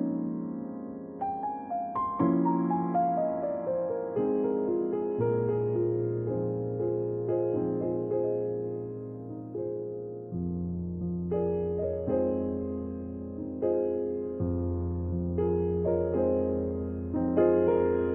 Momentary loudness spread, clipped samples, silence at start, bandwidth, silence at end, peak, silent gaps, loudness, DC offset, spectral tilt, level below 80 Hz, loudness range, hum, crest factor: 10 LU; under 0.1%; 0 s; 3.1 kHz; 0 s; -12 dBFS; none; -30 LUFS; under 0.1%; -13.5 dB/octave; -56 dBFS; 5 LU; none; 18 dB